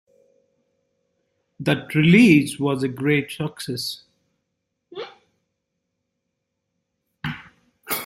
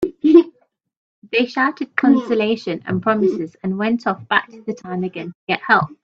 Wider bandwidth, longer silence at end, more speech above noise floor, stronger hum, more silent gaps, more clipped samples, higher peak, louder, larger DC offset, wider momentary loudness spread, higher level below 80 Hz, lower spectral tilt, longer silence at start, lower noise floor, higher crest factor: first, 16.5 kHz vs 7 kHz; about the same, 0 s vs 0.1 s; first, 59 dB vs 38 dB; neither; second, none vs 0.97-1.22 s, 5.35-5.47 s; neither; about the same, -2 dBFS vs 0 dBFS; about the same, -20 LUFS vs -18 LUFS; neither; first, 24 LU vs 13 LU; about the same, -60 dBFS vs -60 dBFS; about the same, -6 dB/octave vs -7 dB/octave; first, 1.6 s vs 0 s; first, -78 dBFS vs -57 dBFS; about the same, 22 dB vs 18 dB